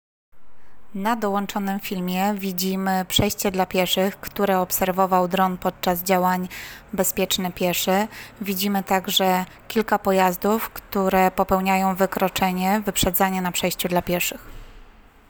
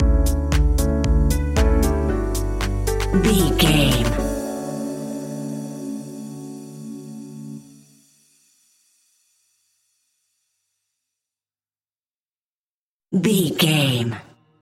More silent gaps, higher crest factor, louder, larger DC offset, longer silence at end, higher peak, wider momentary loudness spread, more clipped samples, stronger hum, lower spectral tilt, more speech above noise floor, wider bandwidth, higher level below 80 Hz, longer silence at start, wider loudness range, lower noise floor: second, none vs 12.17-12.25 s, 12.43-13.00 s; about the same, 16 dB vs 18 dB; about the same, -22 LUFS vs -21 LUFS; neither; about the same, 0.4 s vs 0.4 s; about the same, -6 dBFS vs -4 dBFS; second, 7 LU vs 19 LU; neither; neither; about the same, -4 dB/octave vs -5 dB/octave; second, 28 dB vs over 73 dB; first, over 20 kHz vs 16.5 kHz; second, -46 dBFS vs -26 dBFS; first, 0.35 s vs 0 s; second, 2 LU vs 20 LU; second, -50 dBFS vs under -90 dBFS